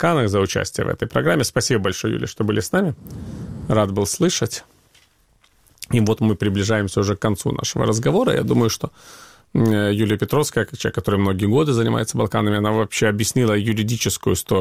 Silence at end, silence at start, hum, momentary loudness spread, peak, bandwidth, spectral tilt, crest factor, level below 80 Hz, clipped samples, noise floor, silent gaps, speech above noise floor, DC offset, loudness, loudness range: 0 s; 0 s; none; 6 LU; -2 dBFS; 16 kHz; -5 dB/octave; 18 dB; -46 dBFS; under 0.1%; -58 dBFS; none; 39 dB; 0.3%; -20 LUFS; 3 LU